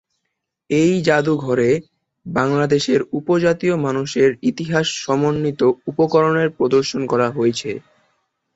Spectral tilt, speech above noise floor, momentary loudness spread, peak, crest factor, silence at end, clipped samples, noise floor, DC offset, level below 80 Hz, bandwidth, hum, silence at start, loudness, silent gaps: -5.5 dB/octave; 59 dB; 5 LU; -2 dBFS; 16 dB; 0.75 s; under 0.1%; -77 dBFS; under 0.1%; -56 dBFS; 8 kHz; none; 0.7 s; -18 LUFS; none